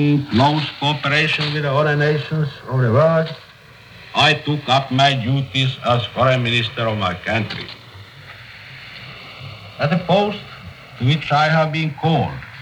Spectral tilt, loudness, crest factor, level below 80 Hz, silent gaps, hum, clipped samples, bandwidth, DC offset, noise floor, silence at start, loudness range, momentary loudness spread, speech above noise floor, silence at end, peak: -6 dB/octave; -18 LUFS; 16 dB; -52 dBFS; none; none; under 0.1%; 10.5 kHz; under 0.1%; -43 dBFS; 0 s; 7 LU; 20 LU; 26 dB; 0 s; -2 dBFS